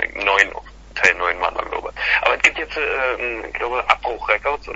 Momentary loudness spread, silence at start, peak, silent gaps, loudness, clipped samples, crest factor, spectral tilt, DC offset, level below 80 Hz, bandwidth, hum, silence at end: 9 LU; 0 s; 0 dBFS; none; -18 LUFS; under 0.1%; 20 dB; -2 dB/octave; under 0.1%; -42 dBFS; 8 kHz; none; 0 s